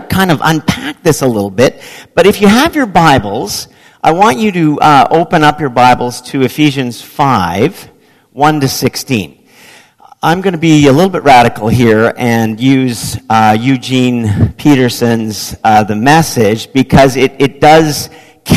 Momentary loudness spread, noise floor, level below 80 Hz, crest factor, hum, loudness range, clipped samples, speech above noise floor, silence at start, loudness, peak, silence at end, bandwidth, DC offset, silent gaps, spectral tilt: 10 LU; -40 dBFS; -36 dBFS; 10 dB; none; 4 LU; 2%; 31 dB; 0 s; -9 LUFS; 0 dBFS; 0 s; 14.5 kHz; under 0.1%; none; -5.5 dB/octave